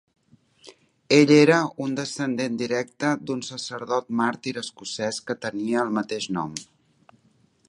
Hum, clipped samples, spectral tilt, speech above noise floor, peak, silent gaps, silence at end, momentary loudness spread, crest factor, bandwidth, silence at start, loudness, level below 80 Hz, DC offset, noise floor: none; under 0.1%; -5 dB/octave; 39 dB; -2 dBFS; none; 1.05 s; 15 LU; 22 dB; 11.5 kHz; 0.65 s; -24 LUFS; -70 dBFS; under 0.1%; -62 dBFS